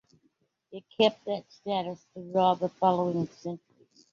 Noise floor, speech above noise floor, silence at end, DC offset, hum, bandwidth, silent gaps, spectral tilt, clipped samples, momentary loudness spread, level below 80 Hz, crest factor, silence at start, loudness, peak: -72 dBFS; 44 dB; 0.55 s; under 0.1%; none; 7.6 kHz; none; -6.5 dB/octave; under 0.1%; 18 LU; -74 dBFS; 20 dB; 0.7 s; -29 LUFS; -10 dBFS